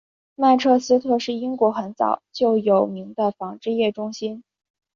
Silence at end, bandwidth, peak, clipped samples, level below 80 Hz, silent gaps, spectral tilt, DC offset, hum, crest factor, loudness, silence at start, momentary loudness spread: 0.55 s; 7.4 kHz; -4 dBFS; under 0.1%; -68 dBFS; none; -5.5 dB/octave; under 0.1%; none; 16 dB; -21 LUFS; 0.4 s; 11 LU